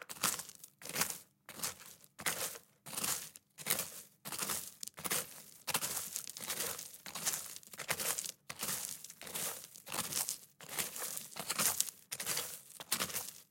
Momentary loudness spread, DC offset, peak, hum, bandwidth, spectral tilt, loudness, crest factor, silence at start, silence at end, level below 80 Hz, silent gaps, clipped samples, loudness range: 11 LU; under 0.1%; -6 dBFS; none; 17 kHz; -0.5 dB/octave; -38 LUFS; 36 dB; 0 s; 0.05 s; -80 dBFS; none; under 0.1%; 2 LU